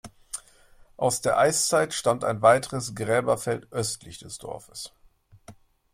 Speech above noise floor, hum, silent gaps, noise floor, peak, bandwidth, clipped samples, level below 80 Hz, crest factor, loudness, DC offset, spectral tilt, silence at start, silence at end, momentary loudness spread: 30 dB; none; none; -54 dBFS; -4 dBFS; 16 kHz; under 0.1%; -58 dBFS; 22 dB; -24 LUFS; under 0.1%; -3.5 dB/octave; 0.05 s; 0.4 s; 18 LU